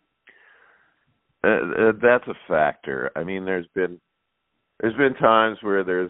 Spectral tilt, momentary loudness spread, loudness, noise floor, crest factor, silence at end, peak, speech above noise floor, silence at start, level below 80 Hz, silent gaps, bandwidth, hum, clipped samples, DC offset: -3.5 dB/octave; 10 LU; -22 LUFS; -76 dBFS; 22 dB; 0 s; -2 dBFS; 55 dB; 1.45 s; -60 dBFS; none; 4 kHz; none; under 0.1%; under 0.1%